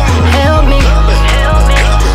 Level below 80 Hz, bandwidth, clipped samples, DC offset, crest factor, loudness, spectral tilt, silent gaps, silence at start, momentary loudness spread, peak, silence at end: -8 dBFS; 13 kHz; under 0.1%; under 0.1%; 6 dB; -9 LUFS; -5.5 dB/octave; none; 0 s; 1 LU; 0 dBFS; 0 s